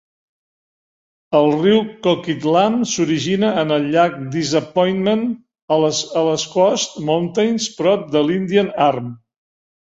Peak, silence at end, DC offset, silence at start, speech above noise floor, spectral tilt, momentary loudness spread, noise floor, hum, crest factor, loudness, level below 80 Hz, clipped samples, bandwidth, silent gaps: -2 dBFS; 0.65 s; under 0.1%; 1.3 s; over 73 dB; -5 dB/octave; 4 LU; under -90 dBFS; none; 16 dB; -17 LUFS; -60 dBFS; under 0.1%; 8 kHz; 5.62-5.68 s